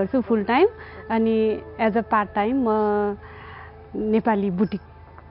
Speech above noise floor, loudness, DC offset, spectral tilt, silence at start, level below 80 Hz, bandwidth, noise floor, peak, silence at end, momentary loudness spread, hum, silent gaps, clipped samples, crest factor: 19 dB; -22 LUFS; under 0.1%; -5.5 dB/octave; 0 s; -52 dBFS; 5.6 kHz; -41 dBFS; -6 dBFS; 0 s; 17 LU; none; none; under 0.1%; 16 dB